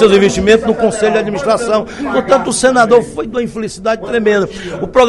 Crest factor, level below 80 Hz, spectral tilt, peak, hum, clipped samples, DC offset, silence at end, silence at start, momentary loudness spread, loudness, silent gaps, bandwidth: 12 dB; -38 dBFS; -4.5 dB/octave; 0 dBFS; none; 0.3%; under 0.1%; 0 s; 0 s; 9 LU; -13 LUFS; none; 12 kHz